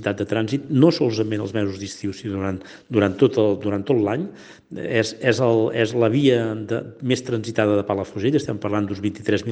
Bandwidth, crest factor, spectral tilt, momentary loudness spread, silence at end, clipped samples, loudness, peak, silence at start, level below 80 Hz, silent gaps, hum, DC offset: 9.2 kHz; 20 dB; -6.5 dB/octave; 10 LU; 0 s; under 0.1%; -21 LUFS; -2 dBFS; 0 s; -62 dBFS; none; none; under 0.1%